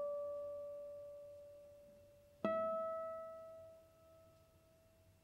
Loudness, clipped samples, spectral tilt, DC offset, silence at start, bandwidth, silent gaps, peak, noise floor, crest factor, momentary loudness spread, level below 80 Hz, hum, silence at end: -45 LUFS; under 0.1%; -7 dB/octave; under 0.1%; 0 s; 16 kHz; none; -24 dBFS; -70 dBFS; 24 dB; 26 LU; -80 dBFS; none; 0.05 s